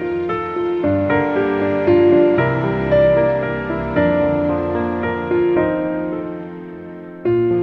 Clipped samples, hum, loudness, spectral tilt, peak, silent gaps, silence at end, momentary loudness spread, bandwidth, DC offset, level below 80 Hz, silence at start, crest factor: under 0.1%; none; -17 LUFS; -9.5 dB/octave; -4 dBFS; none; 0 s; 12 LU; 4.9 kHz; under 0.1%; -42 dBFS; 0 s; 14 dB